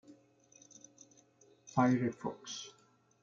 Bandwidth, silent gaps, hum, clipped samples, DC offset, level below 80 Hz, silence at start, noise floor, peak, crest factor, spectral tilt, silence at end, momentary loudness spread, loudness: 7.4 kHz; none; none; under 0.1%; under 0.1%; -76 dBFS; 0.1 s; -66 dBFS; -16 dBFS; 22 dB; -5.5 dB/octave; 0.55 s; 26 LU; -35 LUFS